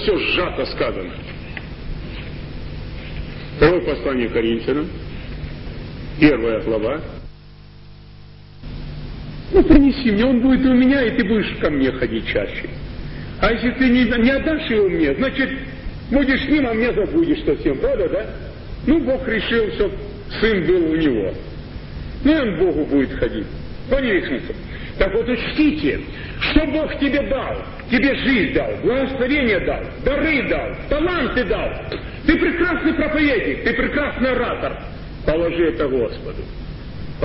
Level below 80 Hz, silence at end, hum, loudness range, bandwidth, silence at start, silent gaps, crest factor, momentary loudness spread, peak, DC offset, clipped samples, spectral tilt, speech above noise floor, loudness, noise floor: -32 dBFS; 0 s; none; 5 LU; 5.8 kHz; 0 s; none; 20 dB; 16 LU; 0 dBFS; under 0.1%; under 0.1%; -11 dB/octave; 23 dB; -19 LUFS; -41 dBFS